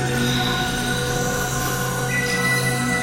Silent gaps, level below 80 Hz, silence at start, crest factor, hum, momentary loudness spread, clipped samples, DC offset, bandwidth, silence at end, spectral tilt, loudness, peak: none; -38 dBFS; 0 s; 14 dB; none; 3 LU; under 0.1%; under 0.1%; 16.5 kHz; 0 s; -3.5 dB/octave; -21 LUFS; -8 dBFS